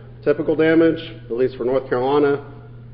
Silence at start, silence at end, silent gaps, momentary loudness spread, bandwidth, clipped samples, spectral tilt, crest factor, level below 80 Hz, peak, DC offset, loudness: 0 s; 0 s; none; 12 LU; 5.2 kHz; under 0.1%; -11.5 dB/octave; 14 dB; -48 dBFS; -6 dBFS; under 0.1%; -19 LUFS